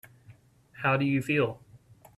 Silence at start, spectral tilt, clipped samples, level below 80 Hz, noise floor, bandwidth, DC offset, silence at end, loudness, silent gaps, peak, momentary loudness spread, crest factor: 0.3 s; -7 dB/octave; under 0.1%; -64 dBFS; -56 dBFS; 13.5 kHz; under 0.1%; 0.4 s; -28 LUFS; none; -14 dBFS; 6 LU; 18 dB